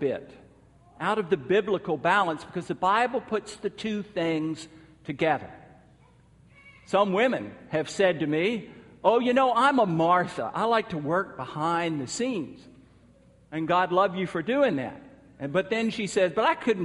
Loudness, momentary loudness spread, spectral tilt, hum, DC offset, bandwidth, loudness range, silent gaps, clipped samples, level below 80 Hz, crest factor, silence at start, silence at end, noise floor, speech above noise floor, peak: -26 LUFS; 12 LU; -5.5 dB/octave; none; under 0.1%; 11.5 kHz; 6 LU; none; under 0.1%; -64 dBFS; 20 dB; 0 s; 0 s; -57 dBFS; 31 dB; -8 dBFS